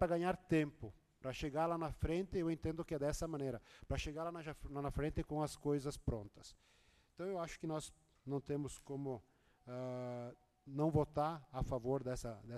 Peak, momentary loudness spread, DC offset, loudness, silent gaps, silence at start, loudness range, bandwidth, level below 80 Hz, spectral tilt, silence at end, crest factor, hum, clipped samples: -22 dBFS; 14 LU; under 0.1%; -42 LUFS; none; 0 s; 6 LU; 13 kHz; -54 dBFS; -6.5 dB/octave; 0 s; 20 dB; none; under 0.1%